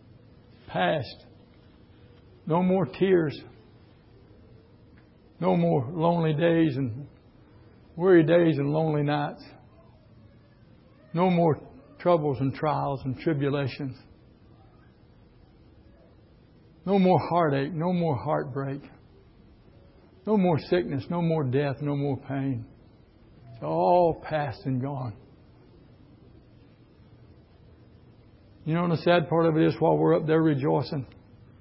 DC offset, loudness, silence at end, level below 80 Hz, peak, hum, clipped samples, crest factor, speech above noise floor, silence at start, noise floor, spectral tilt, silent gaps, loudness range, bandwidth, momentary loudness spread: under 0.1%; -25 LUFS; 0.55 s; -58 dBFS; -8 dBFS; none; under 0.1%; 20 dB; 31 dB; 0.7 s; -55 dBFS; -11.5 dB/octave; none; 8 LU; 5.8 kHz; 14 LU